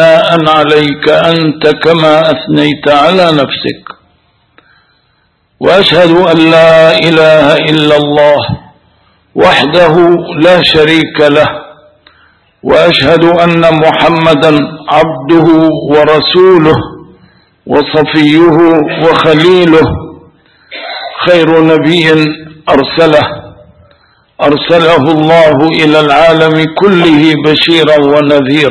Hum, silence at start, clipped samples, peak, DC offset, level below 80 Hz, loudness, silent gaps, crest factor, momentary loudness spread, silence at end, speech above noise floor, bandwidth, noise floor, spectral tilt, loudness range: none; 0 s; 4%; 0 dBFS; 0.3%; -38 dBFS; -6 LUFS; none; 6 dB; 8 LU; 0 s; 48 dB; 11 kHz; -53 dBFS; -6.5 dB/octave; 4 LU